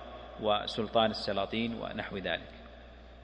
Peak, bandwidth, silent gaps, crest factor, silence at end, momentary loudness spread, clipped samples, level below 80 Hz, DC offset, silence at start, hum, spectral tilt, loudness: -12 dBFS; 9.6 kHz; none; 22 dB; 0 s; 22 LU; under 0.1%; -54 dBFS; under 0.1%; 0 s; none; -5.5 dB/octave; -33 LUFS